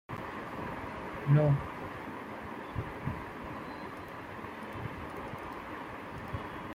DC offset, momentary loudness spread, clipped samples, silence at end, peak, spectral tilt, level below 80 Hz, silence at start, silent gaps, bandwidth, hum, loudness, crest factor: under 0.1%; 14 LU; under 0.1%; 0 s; -16 dBFS; -8 dB/octave; -56 dBFS; 0.1 s; none; 15 kHz; none; -37 LUFS; 20 dB